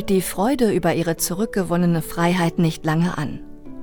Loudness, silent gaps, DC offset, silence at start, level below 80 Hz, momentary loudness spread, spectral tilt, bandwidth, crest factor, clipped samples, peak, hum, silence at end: -21 LUFS; none; under 0.1%; 0 s; -42 dBFS; 8 LU; -5.5 dB/octave; over 20 kHz; 14 dB; under 0.1%; -6 dBFS; none; 0 s